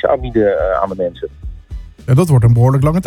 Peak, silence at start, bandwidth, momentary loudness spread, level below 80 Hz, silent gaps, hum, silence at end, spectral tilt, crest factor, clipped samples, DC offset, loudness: 0 dBFS; 0.05 s; 13.5 kHz; 21 LU; -30 dBFS; none; none; 0 s; -8.5 dB/octave; 14 dB; under 0.1%; under 0.1%; -13 LUFS